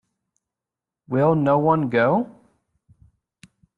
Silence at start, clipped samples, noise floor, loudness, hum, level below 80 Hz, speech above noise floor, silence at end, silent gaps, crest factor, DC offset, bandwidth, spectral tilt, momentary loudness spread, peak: 1.1 s; under 0.1%; -88 dBFS; -20 LUFS; none; -64 dBFS; 69 dB; 1.5 s; none; 18 dB; under 0.1%; 5.2 kHz; -9.5 dB/octave; 8 LU; -6 dBFS